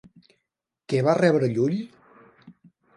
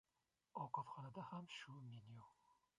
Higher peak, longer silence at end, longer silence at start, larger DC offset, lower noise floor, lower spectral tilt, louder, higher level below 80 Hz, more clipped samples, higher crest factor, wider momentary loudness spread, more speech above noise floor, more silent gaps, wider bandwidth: first, -6 dBFS vs -32 dBFS; first, 0.45 s vs 0.25 s; first, 0.9 s vs 0.55 s; neither; second, -82 dBFS vs -90 dBFS; first, -7.5 dB/octave vs -5.5 dB/octave; first, -23 LUFS vs -53 LUFS; first, -68 dBFS vs -88 dBFS; neither; about the same, 20 dB vs 22 dB; about the same, 11 LU vs 12 LU; first, 61 dB vs 34 dB; neither; about the same, 11.5 kHz vs 11 kHz